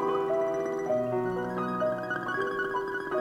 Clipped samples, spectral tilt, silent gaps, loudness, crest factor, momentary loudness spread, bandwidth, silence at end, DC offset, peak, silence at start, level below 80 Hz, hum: under 0.1%; -6.5 dB/octave; none; -30 LUFS; 12 dB; 3 LU; 15.5 kHz; 0 s; under 0.1%; -18 dBFS; 0 s; -62 dBFS; none